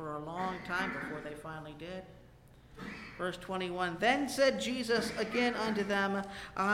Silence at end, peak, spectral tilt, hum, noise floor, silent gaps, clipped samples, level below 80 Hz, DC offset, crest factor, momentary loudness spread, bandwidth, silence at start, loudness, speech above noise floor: 0 s; -16 dBFS; -4.5 dB/octave; none; -58 dBFS; none; under 0.1%; -60 dBFS; under 0.1%; 20 dB; 15 LU; 16.5 kHz; 0 s; -34 LUFS; 24 dB